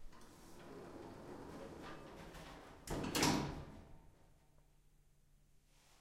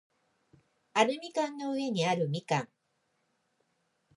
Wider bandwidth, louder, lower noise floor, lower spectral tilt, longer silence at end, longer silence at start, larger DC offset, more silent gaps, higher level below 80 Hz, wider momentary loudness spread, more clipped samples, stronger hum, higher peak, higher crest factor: first, 16 kHz vs 11.5 kHz; second, -43 LUFS vs -31 LUFS; second, -69 dBFS vs -77 dBFS; second, -3.5 dB/octave vs -5 dB/octave; second, 0.05 s vs 1.5 s; second, 0 s vs 0.95 s; neither; neither; first, -60 dBFS vs -84 dBFS; first, 24 LU vs 6 LU; neither; neither; second, -20 dBFS vs -10 dBFS; about the same, 26 dB vs 24 dB